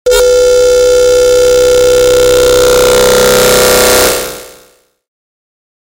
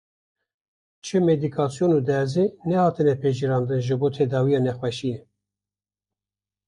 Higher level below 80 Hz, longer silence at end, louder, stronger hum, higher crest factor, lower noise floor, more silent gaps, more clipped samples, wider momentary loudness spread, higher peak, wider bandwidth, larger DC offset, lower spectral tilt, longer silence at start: first, -28 dBFS vs -62 dBFS; about the same, 1.5 s vs 1.5 s; first, -6 LUFS vs -23 LUFS; second, none vs 50 Hz at -50 dBFS; second, 8 dB vs 16 dB; second, -45 dBFS vs under -90 dBFS; neither; neither; second, 2 LU vs 7 LU; first, 0 dBFS vs -8 dBFS; first, 17.5 kHz vs 11 kHz; neither; second, -2 dB/octave vs -7.5 dB/octave; second, 0.05 s vs 1.05 s